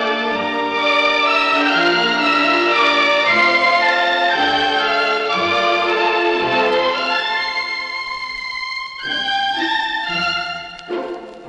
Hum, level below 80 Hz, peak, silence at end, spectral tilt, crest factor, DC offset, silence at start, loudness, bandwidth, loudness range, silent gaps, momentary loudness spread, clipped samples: none; -54 dBFS; -2 dBFS; 0 s; -3 dB/octave; 14 dB; under 0.1%; 0 s; -16 LUFS; 9.8 kHz; 7 LU; none; 11 LU; under 0.1%